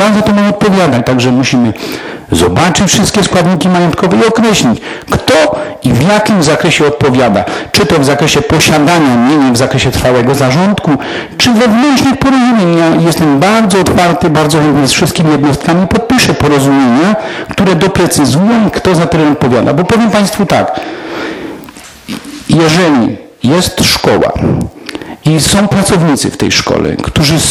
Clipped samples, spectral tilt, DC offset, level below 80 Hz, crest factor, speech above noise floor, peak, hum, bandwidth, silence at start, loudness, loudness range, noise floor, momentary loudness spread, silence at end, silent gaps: under 0.1%; -5 dB/octave; under 0.1%; -32 dBFS; 8 dB; 22 dB; 0 dBFS; none; 16.5 kHz; 0 s; -8 LUFS; 3 LU; -30 dBFS; 8 LU; 0 s; none